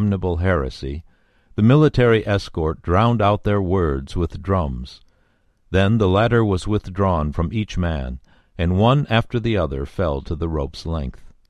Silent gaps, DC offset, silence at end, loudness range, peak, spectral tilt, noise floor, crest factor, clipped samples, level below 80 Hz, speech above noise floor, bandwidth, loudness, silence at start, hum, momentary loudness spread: none; under 0.1%; 0.2 s; 3 LU; 0 dBFS; -8 dB/octave; -61 dBFS; 18 dB; under 0.1%; -32 dBFS; 42 dB; 10 kHz; -20 LUFS; 0 s; none; 12 LU